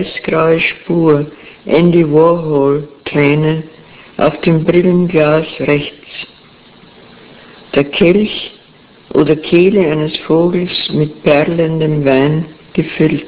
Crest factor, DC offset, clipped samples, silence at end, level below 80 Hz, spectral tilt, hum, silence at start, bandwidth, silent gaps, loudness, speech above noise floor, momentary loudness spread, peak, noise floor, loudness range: 12 dB; under 0.1%; 0.4%; 0 s; -44 dBFS; -11 dB/octave; none; 0 s; 4 kHz; none; -12 LUFS; 31 dB; 11 LU; 0 dBFS; -43 dBFS; 4 LU